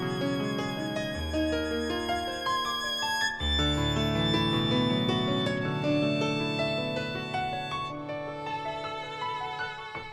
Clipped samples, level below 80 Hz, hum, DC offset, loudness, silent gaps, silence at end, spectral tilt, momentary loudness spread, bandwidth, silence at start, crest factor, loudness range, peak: under 0.1%; -44 dBFS; none; under 0.1%; -29 LUFS; none; 0 s; -5 dB/octave; 9 LU; 16 kHz; 0 s; 16 dB; 5 LU; -14 dBFS